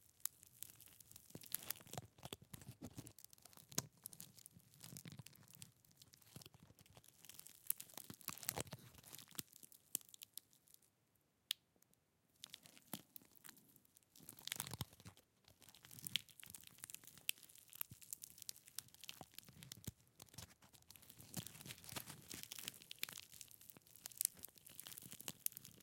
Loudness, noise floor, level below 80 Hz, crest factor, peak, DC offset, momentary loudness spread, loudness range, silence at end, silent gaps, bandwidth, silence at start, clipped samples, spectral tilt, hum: -51 LUFS; -81 dBFS; -82 dBFS; 44 dB; -10 dBFS; under 0.1%; 17 LU; 6 LU; 0 s; none; 17 kHz; 0 s; under 0.1%; -1.5 dB/octave; none